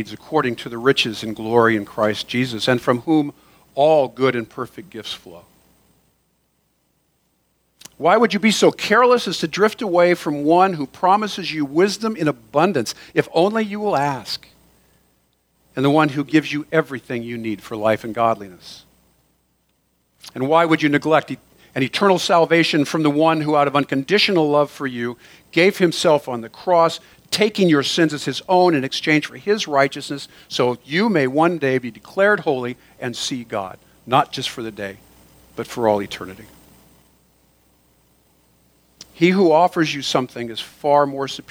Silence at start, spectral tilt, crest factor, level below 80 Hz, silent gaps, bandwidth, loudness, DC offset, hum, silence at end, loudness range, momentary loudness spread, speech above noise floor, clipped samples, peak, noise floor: 0 s; -5 dB/octave; 18 dB; -60 dBFS; none; 20 kHz; -18 LUFS; under 0.1%; none; 0.1 s; 8 LU; 14 LU; 47 dB; under 0.1%; 0 dBFS; -66 dBFS